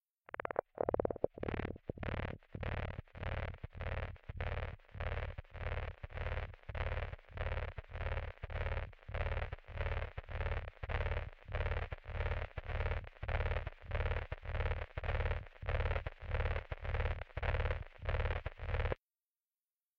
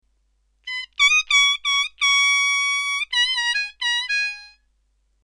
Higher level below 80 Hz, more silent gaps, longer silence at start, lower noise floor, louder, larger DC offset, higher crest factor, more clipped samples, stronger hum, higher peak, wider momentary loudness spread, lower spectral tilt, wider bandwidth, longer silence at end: first, -44 dBFS vs -60 dBFS; neither; second, 0.4 s vs 0.65 s; first, under -90 dBFS vs -66 dBFS; second, -42 LUFS vs -18 LUFS; neither; first, 24 dB vs 16 dB; neither; neither; second, -16 dBFS vs -6 dBFS; second, 7 LU vs 14 LU; first, -8 dB/octave vs 7 dB/octave; second, 5.6 kHz vs 14 kHz; first, 1.05 s vs 0.75 s